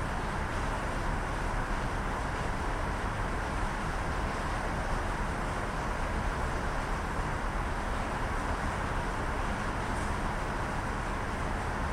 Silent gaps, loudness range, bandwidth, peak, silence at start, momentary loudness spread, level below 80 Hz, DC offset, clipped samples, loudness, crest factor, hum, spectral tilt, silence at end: none; 0 LU; 14 kHz; -18 dBFS; 0 s; 1 LU; -36 dBFS; under 0.1%; under 0.1%; -34 LUFS; 14 dB; none; -5.5 dB/octave; 0 s